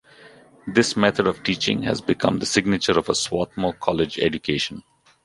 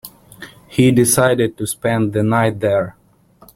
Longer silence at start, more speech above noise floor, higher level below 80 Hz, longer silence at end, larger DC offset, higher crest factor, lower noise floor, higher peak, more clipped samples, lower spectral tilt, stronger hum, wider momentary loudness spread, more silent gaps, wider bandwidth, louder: first, 0.25 s vs 0.05 s; second, 27 dB vs 35 dB; about the same, -50 dBFS vs -48 dBFS; second, 0.45 s vs 0.65 s; neither; about the same, 20 dB vs 16 dB; about the same, -49 dBFS vs -50 dBFS; about the same, -2 dBFS vs 0 dBFS; neither; about the same, -4 dB/octave vs -5 dB/octave; neither; about the same, 6 LU vs 8 LU; neither; second, 11.5 kHz vs 16.5 kHz; second, -22 LUFS vs -16 LUFS